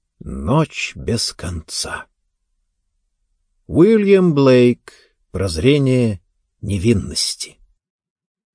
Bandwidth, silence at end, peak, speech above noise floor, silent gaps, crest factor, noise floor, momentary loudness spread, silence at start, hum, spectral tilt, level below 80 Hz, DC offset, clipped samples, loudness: 10.5 kHz; 1.05 s; -2 dBFS; 54 dB; none; 18 dB; -70 dBFS; 17 LU; 0.25 s; none; -5.5 dB/octave; -40 dBFS; under 0.1%; under 0.1%; -17 LUFS